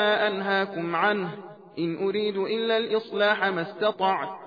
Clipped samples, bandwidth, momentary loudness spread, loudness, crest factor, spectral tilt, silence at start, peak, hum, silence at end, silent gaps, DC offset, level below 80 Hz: under 0.1%; 5 kHz; 8 LU; -26 LUFS; 16 dB; -7 dB/octave; 0 s; -10 dBFS; none; 0 s; none; under 0.1%; -78 dBFS